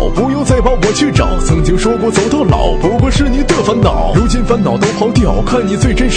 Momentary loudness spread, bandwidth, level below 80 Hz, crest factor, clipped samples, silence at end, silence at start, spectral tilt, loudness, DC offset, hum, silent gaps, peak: 2 LU; 10 kHz; -16 dBFS; 10 dB; under 0.1%; 0 s; 0 s; -6 dB/octave; -12 LUFS; under 0.1%; none; none; 0 dBFS